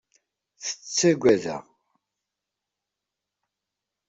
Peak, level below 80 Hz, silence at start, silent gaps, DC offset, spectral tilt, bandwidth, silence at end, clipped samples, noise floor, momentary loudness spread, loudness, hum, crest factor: -6 dBFS; -66 dBFS; 0.6 s; none; under 0.1%; -4 dB/octave; 8 kHz; 2.5 s; under 0.1%; -86 dBFS; 15 LU; -23 LUFS; none; 24 dB